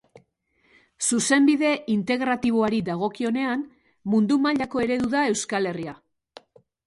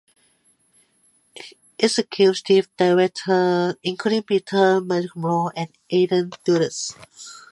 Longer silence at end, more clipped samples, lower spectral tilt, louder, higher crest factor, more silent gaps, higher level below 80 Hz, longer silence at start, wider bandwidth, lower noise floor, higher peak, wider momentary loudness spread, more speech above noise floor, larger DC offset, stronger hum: first, 0.9 s vs 0.15 s; neither; about the same, -4 dB/octave vs -5 dB/octave; second, -23 LUFS vs -20 LUFS; about the same, 16 dB vs 20 dB; neither; first, -60 dBFS vs -72 dBFS; second, 1 s vs 1.35 s; about the same, 11.5 kHz vs 11.5 kHz; first, -66 dBFS vs -62 dBFS; second, -8 dBFS vs -2 dBFS; second, 10 LU vs 21 LU; about the same, 44 dB vs 42 dB; neither; neither